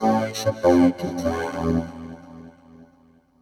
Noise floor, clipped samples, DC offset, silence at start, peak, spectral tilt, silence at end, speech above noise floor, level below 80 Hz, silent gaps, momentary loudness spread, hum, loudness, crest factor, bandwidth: -57 dBFS; under 0.1%; under 0.1%; 0 s; -4 dBFS; -6 dB/octave; 0.6 s; 36 dB; -46 dBFS; none; 22 LU; none; -22 LUFS; 18 dB; 14 kHz